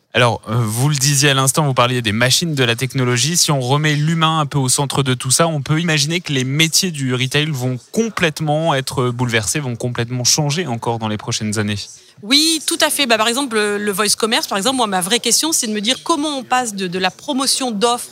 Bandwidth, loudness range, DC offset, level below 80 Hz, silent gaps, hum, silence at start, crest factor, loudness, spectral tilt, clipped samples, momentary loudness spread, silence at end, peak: 16.5 kHz; 3 LU; under 0.1%; -54 dBFS; none; none; 0.15 s; 16 dB; -16 LUFS; -3.5 dB/octave; under 0.1%; 7 LU; 0 s; 0 dBFS